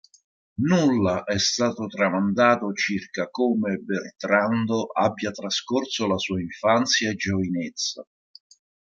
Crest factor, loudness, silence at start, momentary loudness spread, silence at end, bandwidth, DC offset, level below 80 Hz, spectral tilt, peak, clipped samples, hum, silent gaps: 20 dB; -23 LUFS; 0.6 s; 9 LU; 0.85 s; 7.6 kHz; under 0.1%; -64 dBFS; -4.5 dB/octave; -4 dBFS; under 0.1%; none; none